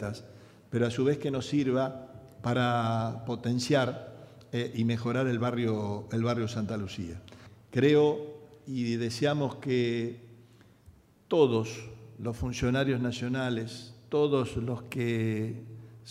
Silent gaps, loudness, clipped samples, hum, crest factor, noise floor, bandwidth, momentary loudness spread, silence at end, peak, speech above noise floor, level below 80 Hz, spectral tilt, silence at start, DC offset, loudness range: none; -30 LUFS; under 0.1%; none; 20 dB; -58 dBFS; 13.5 kHz; 16 LU; 0 s; -10 dBFS; 29 dB; -58 dBFS; -6.5 dB/octave; 0 s; under 0.1%; 2 LU